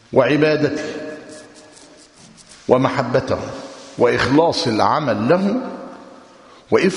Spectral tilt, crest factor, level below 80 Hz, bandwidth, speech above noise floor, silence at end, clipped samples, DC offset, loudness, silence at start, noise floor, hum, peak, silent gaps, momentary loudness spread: -6 dB/octave; 18 dB; -52 dBFS; 11 kHz; 29 dB; 0 s; under 0.1%; under 0.1%; -17 LUFS; 0.1 s; -45 dBFS; none; 0 dBFS; none; 19 LU